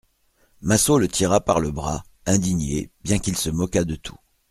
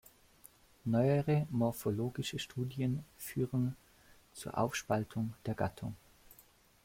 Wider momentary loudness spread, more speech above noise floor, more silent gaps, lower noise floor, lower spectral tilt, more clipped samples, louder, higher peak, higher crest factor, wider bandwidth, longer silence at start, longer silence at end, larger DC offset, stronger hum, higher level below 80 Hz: second, 11 LU vs 14 LU; first, 41 dB vs 30 dB; neither; about the same, -63 dBFS vs -64 dBFS; second, -4.5 dB/octave vs -6.5 dB/octave; neither; first, -22 LUFS vs -36 LUFS; first, -2 dBFS vs -18 dBFS; about the same, 20 dB vs 20 dB; about the same, 15.5 kHz vs 16.5 kHz; second, 0.6 s vs 0.85 s; second, 0.4 s vs 0.9 s; neither; neither; first, -40 dBFS vs -64 dBFS